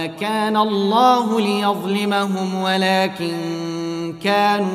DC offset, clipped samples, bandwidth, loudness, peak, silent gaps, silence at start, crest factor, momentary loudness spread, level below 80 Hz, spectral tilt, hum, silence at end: under 0.1%; under 0.1%; 15.5 kHz; -19 LUFS; -4 dBFS; none; 0 s; 16 dB; 10 LU; -64 dBFS; -5 dB/octave; none; 0 s